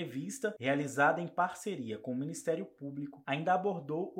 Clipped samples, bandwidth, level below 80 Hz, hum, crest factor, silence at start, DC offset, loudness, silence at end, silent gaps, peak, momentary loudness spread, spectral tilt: under 0.1%; 16 kHz; -84 dBFS; none; 20 dB; 0 s; under 0.1%; -34 LUFS; 0 s; none; -14 dBFS; 11 LU; -5 dB/octave